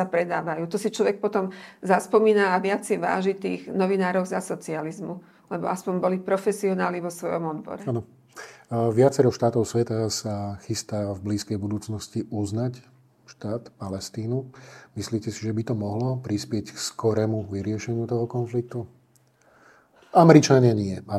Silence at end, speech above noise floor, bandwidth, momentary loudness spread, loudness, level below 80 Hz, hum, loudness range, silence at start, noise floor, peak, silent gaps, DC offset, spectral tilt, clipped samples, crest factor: 0 s; 37 dB; 15 kHz; 14 LU; -25 LUFS; -66 dBFS; none; 8 LU; 0 s; -61 dBFS; 0 dBFS; none; under 0.1%; -6 dB/octave; under 0.1%; 24 dB